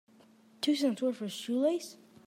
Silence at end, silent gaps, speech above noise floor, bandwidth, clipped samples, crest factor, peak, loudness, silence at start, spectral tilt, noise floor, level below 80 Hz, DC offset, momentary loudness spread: 0.35 s; none; 30 dB; 16 kHz; under 0.1%; 14 dB; -18 dBFS; -32 LUFS; 0.6 s; -4.5 dB/octave; -61 dBFS; -90 dBFS; under 0.1%; 8 LU